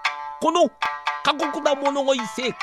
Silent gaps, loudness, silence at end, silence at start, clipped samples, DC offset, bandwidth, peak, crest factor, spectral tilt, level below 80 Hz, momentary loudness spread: none; -22 LUFS; 0 s; 0 s; under 0.1%; under 0.1%; 13.5 kHz; -4 dBFS; 18 dB; -2.5 dB/octave; -66 dBFS; 6 LU